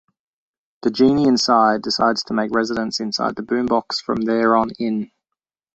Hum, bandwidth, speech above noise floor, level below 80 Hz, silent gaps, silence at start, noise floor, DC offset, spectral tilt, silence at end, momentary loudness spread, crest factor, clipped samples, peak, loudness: none; 8.2 kHz; 66 dB; -54 dBFS; none; 0.85 s; -84 dBFS; under 0.1%; -4.5 dB/octave; 0.7 s; 9 LU; 18 dB; under 0.1%; -2 dBFS; -19 LUFS